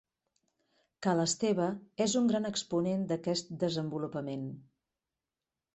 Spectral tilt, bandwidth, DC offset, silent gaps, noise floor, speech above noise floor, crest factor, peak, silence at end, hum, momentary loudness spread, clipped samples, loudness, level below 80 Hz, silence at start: -5 dB/octave; 8.4 kHz; under 0.1%; none; under -90 dBFS; over 58 dB; 18 dB; -16 dBFS; 1.15 s; none; 9 LU; under 0.1%; -32 LUFS; -72 dBFS; 1 s